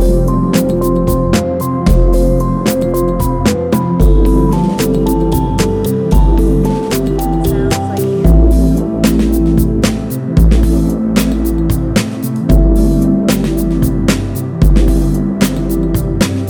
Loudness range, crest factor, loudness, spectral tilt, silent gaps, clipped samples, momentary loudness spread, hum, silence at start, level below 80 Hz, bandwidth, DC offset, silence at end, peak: 1 LU; 10 dB; -13 LUFS; -7 dB/octave; none; under 0.1%; 4 LU; none; 0 s; -14 dBFS; over 20 kHz; under 0.1%; 0 s; 0 dBFS